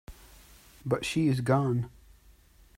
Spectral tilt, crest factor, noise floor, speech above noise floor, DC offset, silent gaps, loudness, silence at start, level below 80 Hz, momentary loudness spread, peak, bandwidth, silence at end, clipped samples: -6.5 dB/octave; 20 dB; -58 dBFS; 31 dB; under 0.1%; none; -28 LUFS; 0.1 s; -54 dBFS; 13 LU; -12 dBFS; 16 kHz; 0.9 s; under 0.1%